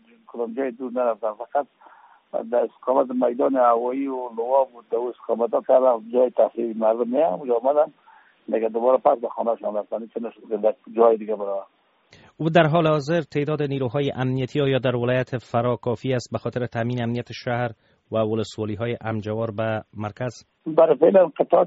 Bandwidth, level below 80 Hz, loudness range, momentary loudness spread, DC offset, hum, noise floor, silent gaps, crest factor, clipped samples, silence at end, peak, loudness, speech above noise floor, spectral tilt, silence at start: 7.6 kHz; -62 dBFS; 5 LU; 11 LU; under 0.1%; none; -55 dBFS; none; 18 dB; under 0.1%; 0 s; -4 dBFS; -23 LUFS; 33 dB; -6 dB/octave; 0.3 s